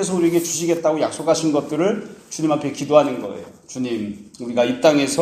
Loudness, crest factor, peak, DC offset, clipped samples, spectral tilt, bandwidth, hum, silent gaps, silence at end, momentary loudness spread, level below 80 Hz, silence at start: -20 LUFS; 20 dB; 0 dBFS; under 0.1%; under 0.1%; -4.5 dB/octave; 15.5 kHz; none; none; 0 s; 15 LU; -62 dBFS; 0 s